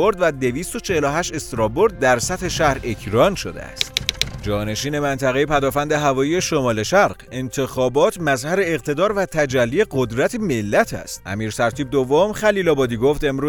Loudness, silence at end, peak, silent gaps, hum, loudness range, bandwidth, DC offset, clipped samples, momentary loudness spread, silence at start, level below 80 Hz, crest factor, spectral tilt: -19 LUFS; 0 s; 0 dBFS; none; none; 1 LU; over 20 kHz; under 0.1%; under 0.1%; 7 LU; 0 s; -40 dBFS; 20 dB; -4.5 dB/octave